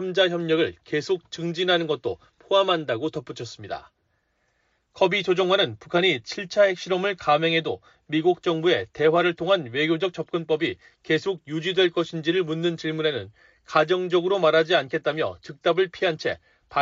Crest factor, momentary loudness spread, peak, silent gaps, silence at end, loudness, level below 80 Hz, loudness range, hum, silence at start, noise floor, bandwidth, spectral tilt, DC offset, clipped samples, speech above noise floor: 18 dB; 10 LU; -6 dBFS; none; 0 s; -23 LUFS; -64 dBFS; 4 LU; none; 0 s; -71 dBFS; 7.6 kHz; -3 dB/octave; under 0.1%; under 0.1%; 47 dB